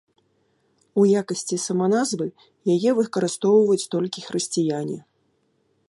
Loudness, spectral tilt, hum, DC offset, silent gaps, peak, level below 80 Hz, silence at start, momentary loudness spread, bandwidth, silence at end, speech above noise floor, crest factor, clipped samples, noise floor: -22 LUFS; -5 dB/octave; none; under 0.1%; none; -6 dBFS; -72 dBFS; 0.95 s; 11 LU; 11.5 kHz; 0.9 s; 46 dB; 16 dB; under 0.1%; -67 dBFS